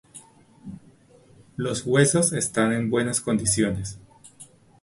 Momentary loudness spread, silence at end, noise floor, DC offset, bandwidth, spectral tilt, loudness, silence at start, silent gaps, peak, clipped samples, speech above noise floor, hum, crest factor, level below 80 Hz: 23 LU; 0.4 s; -54 dBFS; under 0.1%; 11.5 kHz; -4.5 dB/octave; -23 LUFS; 0.15 s; none; -4 dBFS; under 0.1%; 31 dB; none; 20 dB; -52 dBFS